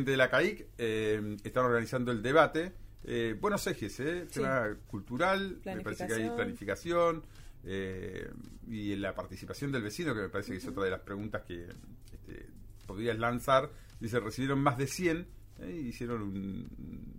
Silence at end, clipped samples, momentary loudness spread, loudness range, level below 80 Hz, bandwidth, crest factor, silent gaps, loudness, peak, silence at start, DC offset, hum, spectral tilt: 0 s; under 0.1%; 17 LU; 7 LU; -52 dBFS; 16 kHz; 22 dB; none; -33 LUFS; -10 dBFS; 0 s; under 0.1%; none; -5.5 dB/octave